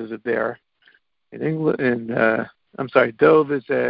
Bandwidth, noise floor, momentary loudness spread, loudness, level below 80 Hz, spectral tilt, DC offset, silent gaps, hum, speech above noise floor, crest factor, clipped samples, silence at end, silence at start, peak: 5.2 kHz; -59 dBFS; 12 LU; -20 LUFS; -60 dBFS; -11 dB/octave; under 0.1%; none; none; 39 dB; 18 dB; under 0.1%; 0 s; 0 s; -2 dBFS